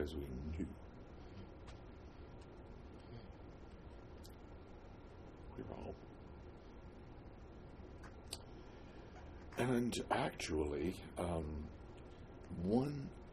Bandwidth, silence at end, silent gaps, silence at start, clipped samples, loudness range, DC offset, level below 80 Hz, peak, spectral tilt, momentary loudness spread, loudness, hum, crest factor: 13 kHz; 0 s; none; 0 s; under 0.1%; 15 LU; under 0.1%; -56 dBFS; -22 dBFS; -6 dB/octave; 18 LU; -44 LUFS; none; 24 dB